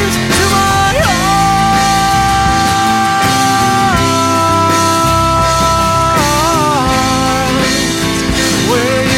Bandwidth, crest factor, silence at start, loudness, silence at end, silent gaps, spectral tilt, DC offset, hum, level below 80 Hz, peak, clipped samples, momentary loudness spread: 16.5 kHz; 10 dB; 0 s; -11 LUFS; 0 s; none; -3.5 dB/octave; under 0.1%; none; -26 dBFS; 0 dBFS; under 0.1%; 2 LU